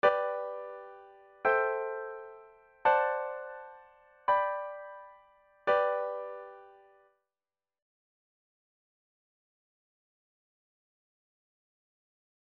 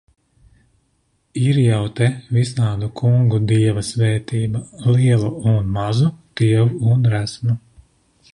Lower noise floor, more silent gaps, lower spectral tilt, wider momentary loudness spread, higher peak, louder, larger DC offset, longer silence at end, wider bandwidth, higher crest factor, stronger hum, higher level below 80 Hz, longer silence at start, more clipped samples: first, under -90 dBFS vs -64 dBFS; neither; second, -5 dB/octave vs -7 dB/octave; first, 21 LU vs 6 LU; second, -12 dBFS vs -4 dBFS; second, -32 LUFS vs -18 LUFS; neither; first, 5.8 s vs 0.75 s; second, 6.2 kHz vs 11 kHz; first, 24 dB vs 14 dB; neither; second, -78 dBFS vs -44 dBFS; second, 0.05 s vs 1.35 s; neither